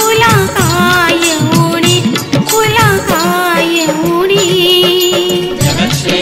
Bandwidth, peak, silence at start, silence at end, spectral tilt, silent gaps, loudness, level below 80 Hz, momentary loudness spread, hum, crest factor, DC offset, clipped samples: 16.5 kHz; 0 dBFS; 0 s; 0 s; -4 dB/octave; none; -9 LUFS; -38 dBFS; 4 LU; none; 10 dB; under 0.1%; under 0.1%